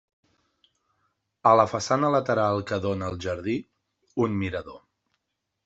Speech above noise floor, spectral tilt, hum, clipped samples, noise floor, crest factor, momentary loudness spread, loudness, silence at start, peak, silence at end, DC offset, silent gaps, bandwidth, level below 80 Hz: 56 dB; -6 dB/octave; none; under 0.1%; -81 dBFS; 22 dB; 12 LU; -25 LUFS; 1.45 s; -4 dBFS; 0.85 s; under 0.1%; none; 8.2 kHz; -62 dBFS